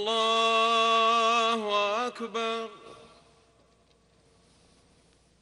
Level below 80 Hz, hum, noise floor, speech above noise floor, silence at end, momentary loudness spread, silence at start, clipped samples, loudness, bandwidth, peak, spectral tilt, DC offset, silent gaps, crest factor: -72 dBFS; none; -64 dBFS; 35 dB; 2.45 s; 10 LU; 0 s; under 0.1%; -25 LUFS; 11.5 kHz; -12 dBFS; -1.5 dB/octave; under 0.1%; none; 16 dB